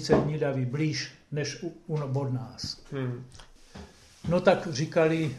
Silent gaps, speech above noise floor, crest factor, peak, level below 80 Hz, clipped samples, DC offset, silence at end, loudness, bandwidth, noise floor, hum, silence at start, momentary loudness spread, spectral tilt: none; 20 dB; 20 dB; -8 dBFS; -54 dBFS; under 0.1%; under 0.1%; 0 s; -29 LUFS; 12 kHz; -48 dBFS; none; 0 s; 19 LU; -6 dB/octave